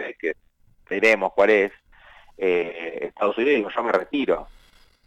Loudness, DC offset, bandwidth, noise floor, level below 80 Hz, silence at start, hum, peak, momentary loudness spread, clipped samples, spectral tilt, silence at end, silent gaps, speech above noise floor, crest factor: -22 LUFS; under 0.1%; 9.8 kHz; -58 dBFS; -56 dBFS; 0 s; none; -6 dBFS; 12 LU; under 0.1%; -5 dB/octave; 0.6 s; none; 36 dB; 16 dB